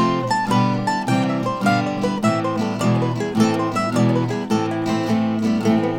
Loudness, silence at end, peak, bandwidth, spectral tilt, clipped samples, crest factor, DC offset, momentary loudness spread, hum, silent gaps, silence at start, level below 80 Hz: -20 LUFS; 0 s; -4 dBFS; 16 kHz; -6.5 dB/octave; under 0.1%; 14 dB; under 0.1%; 3 LU; none; none; 0 s; -54 dBFS